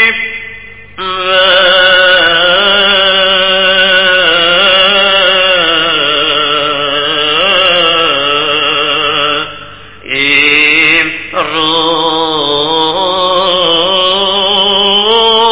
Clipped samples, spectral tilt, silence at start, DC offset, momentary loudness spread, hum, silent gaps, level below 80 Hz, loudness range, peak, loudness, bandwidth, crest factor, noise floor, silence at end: 0.8%; -6 dB/octave; 0 s; 2%; 7 LU; 50 Hz at -40 dBFS; none; -42 dBFS; 3 LU; 0 dBFS; -7 LUFS; 4 kHz; 10 dB; -30 dBFS; 0 s